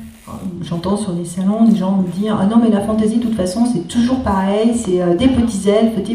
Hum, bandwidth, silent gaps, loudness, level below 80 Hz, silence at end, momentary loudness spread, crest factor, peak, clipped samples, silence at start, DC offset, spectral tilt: none; 13 kHz; none; -16 LUFS; -38 dBFS; 0 s; 9 LU; 14 dB; 0 dBFS; under 0.1%; 0 s; under 0.1%; -6.5 dB/octave